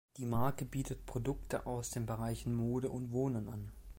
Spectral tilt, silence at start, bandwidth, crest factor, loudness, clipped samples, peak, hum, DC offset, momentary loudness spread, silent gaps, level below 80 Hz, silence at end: -6.5 dB/octave; 0.1 s; 16.5 kHz; 16 dB; -39 LUFS; under 0.1%; -22 dBFS; none; under 0.1%; 5 LU; none; -52 dBFS; 0 s